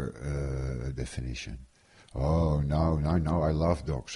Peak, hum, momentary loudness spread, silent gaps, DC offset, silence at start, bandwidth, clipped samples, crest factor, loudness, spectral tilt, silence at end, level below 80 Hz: -12 dBFS; none; 12 LU; none; under 0.1%; 0 s; 11.5 kHz; under 0.1%; 16 dB; -30 LUFS; -7.5 dB/octave; 0 s; -36 dBFS